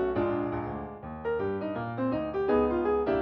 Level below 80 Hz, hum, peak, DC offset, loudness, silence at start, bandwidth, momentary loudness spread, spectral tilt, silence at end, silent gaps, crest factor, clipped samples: -50 dBFS; none; -14 dBFS; under 0.1%; -30 LUFS; 0 s; 5.6 kHz; 11 LU; -10 dB/octave; 0 s; none; 16 dB; under 0.1%